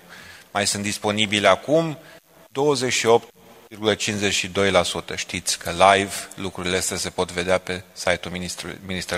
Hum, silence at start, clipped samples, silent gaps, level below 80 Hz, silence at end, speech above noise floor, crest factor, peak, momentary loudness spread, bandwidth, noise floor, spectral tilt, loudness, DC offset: none; 0.1 s; under 0.1%; none; -54 dBFS; 0 s; 22 dB; 22 dB; 0 dBFS; 12 LU; 16 kHz; -44 dBFS; -3 dB/octave; -22 LUFS; under 0.1%